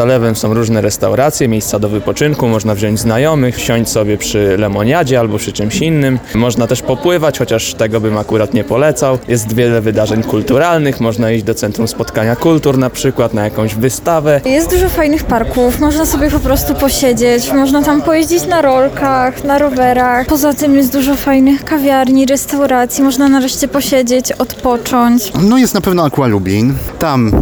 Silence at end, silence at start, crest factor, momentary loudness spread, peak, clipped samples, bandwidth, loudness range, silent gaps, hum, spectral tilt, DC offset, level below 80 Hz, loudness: 0 s; 0 s; 10 dB; 4 LU; 0 dBFS; under 0.1%; over 20 kHz; 2 LU; none; none; -5.5 dB/octave; under 0.1%; -30 dBFS; -12 LUFS